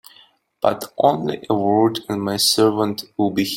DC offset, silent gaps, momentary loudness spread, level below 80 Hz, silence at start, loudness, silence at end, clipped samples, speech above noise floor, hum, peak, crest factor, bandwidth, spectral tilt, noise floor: under 0.1%; none; 8 LU; -60 dBFS; 0.65 s; -19 LUFS; 0 s; under 0.1%; 34 dB; none; -2 dBFS; 18 dB; 16.5 kHz; -4.5 dB/octave; -53 dBFS